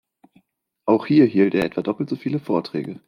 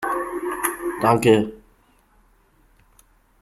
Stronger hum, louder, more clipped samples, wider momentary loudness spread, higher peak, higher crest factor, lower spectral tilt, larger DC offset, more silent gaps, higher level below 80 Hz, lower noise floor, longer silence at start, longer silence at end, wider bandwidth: neither; about the same, -20 LUFS vs -21 LUFS; neither; about the same, 10 LU vs 11 LU; about the same, -4 dBFS vs -4 dBFS; about the same, 18 dB vs 20 dB; first, -8.5 dB/octave vs -5 dB/octave; neither; neither; second, -60 dBFS vs -54 dBFS; first, -64 dBFS vs -58 dBFS; first, 0.85 s vs 0 s; second, 0.1 s vs 1.85 s; second, 9.4 kHz vs 16 kHz